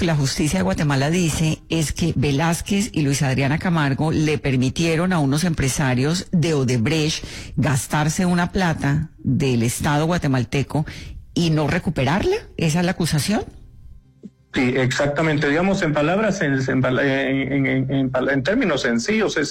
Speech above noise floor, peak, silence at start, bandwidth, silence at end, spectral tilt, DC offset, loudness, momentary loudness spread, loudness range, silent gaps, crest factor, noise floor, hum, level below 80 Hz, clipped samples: 25 dB; -10 dBFS; 0 s; 16.5 kHz; 0 s; -5.5 dB/octave; under 0.1%; -20 LUFS; 4 LU; 2 LU; none; 10 dB; -44 dBFS; none; -40 dBFS; under 0.1%